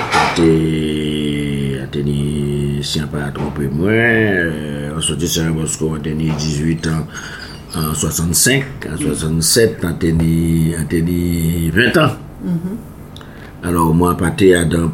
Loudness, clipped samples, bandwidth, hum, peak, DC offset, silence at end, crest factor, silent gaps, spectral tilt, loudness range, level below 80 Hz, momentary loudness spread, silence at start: -16 LUFS; under 0.1%; 17 kHz; none; 0 dBFS; under 0.1%; 0 s; 16 dB; none; -4.5 dB/octave; 4 LU; -32 dBFS; 12 LU; 0 s